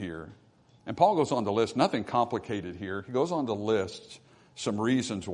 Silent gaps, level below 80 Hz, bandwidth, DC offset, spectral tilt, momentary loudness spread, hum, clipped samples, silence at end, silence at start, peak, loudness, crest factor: none; -66 dBFS; 11 kHz; under 0.1%; -5.5 dB/octave; 17 LU; none; under 0.1%; 0 s; 0 s; -8 dBFS; -29 LUFS; 20 dB